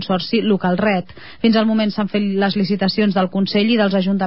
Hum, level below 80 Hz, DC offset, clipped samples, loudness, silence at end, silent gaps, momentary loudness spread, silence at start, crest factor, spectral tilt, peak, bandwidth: none; -54 dBFS; 0.8%; under 0.1%; -17 LUFS; 0 s; none; 4 LU; 0 s; 14 dB; -10.5 dB/octave; -4 dBFS; 5.8 kHz